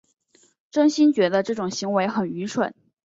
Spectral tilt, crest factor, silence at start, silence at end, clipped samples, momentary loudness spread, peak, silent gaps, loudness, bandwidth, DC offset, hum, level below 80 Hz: -5 dB/octave; 16 dB; 0.75 s; 0.3 s; under 0.1%; 9 LU; -8 dBFS; none; -22 LUFS; 7.8 kHz; under 0.1%; none; -68 dBFS